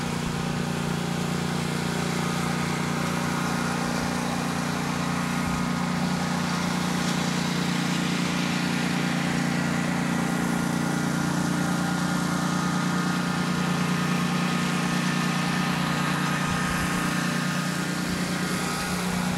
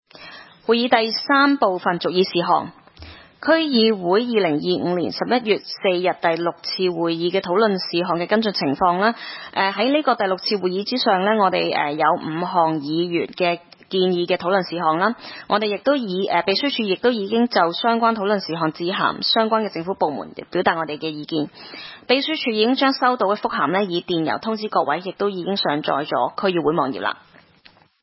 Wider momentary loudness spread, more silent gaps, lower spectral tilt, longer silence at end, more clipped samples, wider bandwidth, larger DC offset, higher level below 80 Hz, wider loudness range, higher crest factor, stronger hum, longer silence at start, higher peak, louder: second, 2 LU vs 7 LU; neither; second, -4.5 dB/octave vs -8.5 dB/octave; second, 0 s vs 0.85 s; neither; first, 16 kHz vs 5.8 kHz; neither; first, -50 dBFS vs -62 dBFS; about the same, 2 LU vs 2 LU; about the same, 14 dB vs 18 dB; neither; second, 0 s vs 0.2 s; second, -12 dBFS vs -2 dBFS; second, -26 LUFS vs -20 LUFS